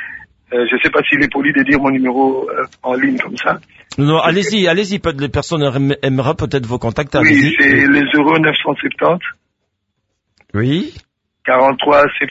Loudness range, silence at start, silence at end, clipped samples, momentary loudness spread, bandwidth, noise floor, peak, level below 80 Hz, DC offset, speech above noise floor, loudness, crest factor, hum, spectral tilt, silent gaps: 4 LU; 0 s; 0 s; under 0.1%; 11 LU; 8 kHz; -70 dBFS; 0 dBFS; -42 dBFS; under 0.1%; 57 dB; -14 LUFS; 14 dB; none; -6 dB/octave; none